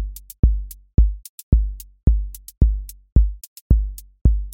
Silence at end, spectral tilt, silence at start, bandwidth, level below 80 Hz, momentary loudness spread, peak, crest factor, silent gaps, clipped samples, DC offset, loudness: 0 s; -8.5 dB/octave; 0 s; 17 kHz; -20 dBFS; 12 LU; -2 dBFS; 16 dB; 0.39-0.43 s, 1.29-1.52 s, 2.03-2.07 s, 3.12-3.16 s, 3.47-3.70 s, 4.21-4.25 s; under 0.1%; under 0.1%; -22 LUFS